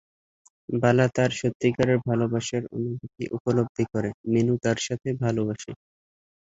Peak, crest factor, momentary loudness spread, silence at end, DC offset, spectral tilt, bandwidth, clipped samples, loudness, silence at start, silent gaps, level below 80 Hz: -6 dBFS; 20 dB; 11 LU; 0.8 s; under 0.1%; -6 dB/octave; 8 kHz; under 0.1%; -25 LUFS; 0.7 s; 1.55-1.60 s, 3.40-3.45 s, 3.69-3.75 s, 4.14-4.24 s; -58 dBFS